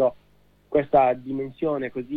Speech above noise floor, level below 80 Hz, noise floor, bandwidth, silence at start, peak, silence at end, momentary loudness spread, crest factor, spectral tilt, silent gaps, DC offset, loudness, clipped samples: 36 dB; -56 dBFS; -60 dBFS; 4.7 kHz; 0 s; -8 dBFS; 0 s; 9 LU; 16 dB; -9.5 dB/octave; none; under 0.1%; -24 LUFS; under 0.1%